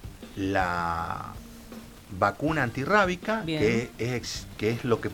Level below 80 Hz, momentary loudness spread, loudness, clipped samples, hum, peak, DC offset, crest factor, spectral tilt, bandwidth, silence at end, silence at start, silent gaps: -48 dBFS; 20 LU; -27 LUFS; under 0.1%; none; -8 dBFS; under 0.1%; 20 dB; -5.5 dB/octave; 19 kHz; 0 s; 0 s; none